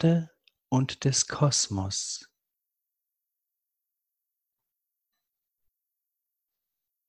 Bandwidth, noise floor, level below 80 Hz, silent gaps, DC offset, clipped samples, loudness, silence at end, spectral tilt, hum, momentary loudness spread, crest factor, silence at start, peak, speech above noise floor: 11.5 kHz; -86 dBFS; -58 dBFS; none; under 0.1%; under 0.1%; -27 LUFS; 4.85 s; -4 dB/octave; none; 11 LU; 22 dB; 0 s; -10 dBFS; 59 dB